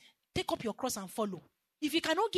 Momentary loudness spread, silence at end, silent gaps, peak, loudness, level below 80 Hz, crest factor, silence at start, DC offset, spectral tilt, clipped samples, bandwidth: 9 LU; 0 s; none; -18 dBFS; -35 LUFS; -64 dBFS; 18 dB; 0.35 s; under 0.1%; -3.5 dB/octave; under 0.1%; 13.5 kHz